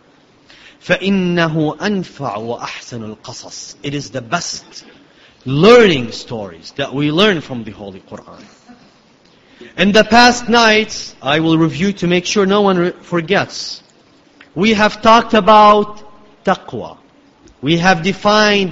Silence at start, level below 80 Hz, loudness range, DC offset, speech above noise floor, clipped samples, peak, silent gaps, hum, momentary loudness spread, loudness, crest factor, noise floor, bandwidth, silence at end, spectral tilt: 0.85 s; -46 dBFS; 8 LU; under 0.1%; 35 dB; under 0.1%; 0 dBFS; none; none; 21 LU; -13 LUFS; 14 dB; -49 dBFS; 8.2 kHz; 0 s; -4.5 dB/octave